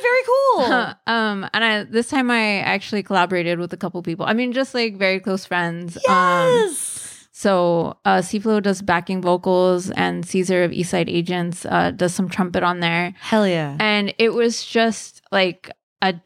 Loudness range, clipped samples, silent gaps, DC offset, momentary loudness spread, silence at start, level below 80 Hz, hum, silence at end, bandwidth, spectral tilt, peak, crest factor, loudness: 2 LU; under 0.1%; 15.83-15.96 s; under 0.1%; 7 LU; 0 s; -60 dBFS; none; 0.05 s; 15.5 kHz; -4.5 dB/octave; -4 dBFS; 16 dB; -19 LUFS